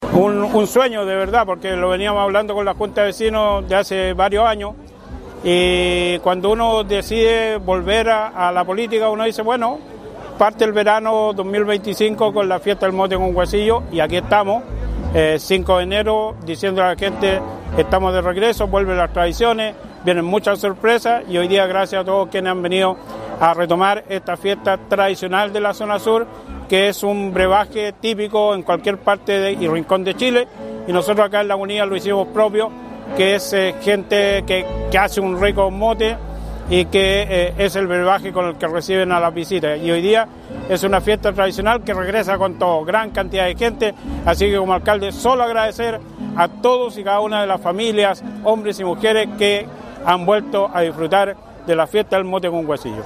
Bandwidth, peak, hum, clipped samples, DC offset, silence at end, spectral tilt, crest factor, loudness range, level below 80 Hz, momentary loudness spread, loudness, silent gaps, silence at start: 15.5 kHz; 0 dBFS; none; under 0.1%; under 0.1%; 0 s; -5 dB/octave; 18 dB; 1 LU; -34 dBFS; 6 LU; -17 LUFS; none; 0 s